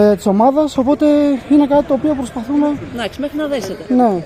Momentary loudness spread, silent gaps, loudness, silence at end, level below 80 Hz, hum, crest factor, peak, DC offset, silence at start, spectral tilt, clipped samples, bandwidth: 9 LU; none; -15 LUFS; 0 s; -44 dBFS; none; 12 dB; -2 dBFS; under 0.1%; 0 s; -6.5 dB/octave; under 0.1%; 14.5 kHz